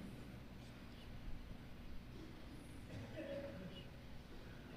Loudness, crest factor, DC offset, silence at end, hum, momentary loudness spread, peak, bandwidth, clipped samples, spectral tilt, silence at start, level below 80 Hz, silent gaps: -54 LUFS; 14 dB; under 0.1%; 0 s; 60 Hz at -60 dBFS; 7 LU; -36 dBFS; 14.5 kHz; under 0.1%; -6.5 dB/octave; 0 s; -58 dBFS; none